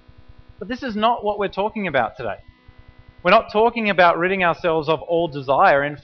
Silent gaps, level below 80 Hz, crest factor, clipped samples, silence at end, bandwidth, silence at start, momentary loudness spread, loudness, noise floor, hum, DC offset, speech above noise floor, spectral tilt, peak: none; -50 dBFS; 18 dB; under 0.1%; 0.05 s; 6.2 kHz; 0.6 s; 14 LU; -19 LUFS; -47 dBFS; none; under 0.1%; 28 dB; -3 dB/octave; -2 dBFS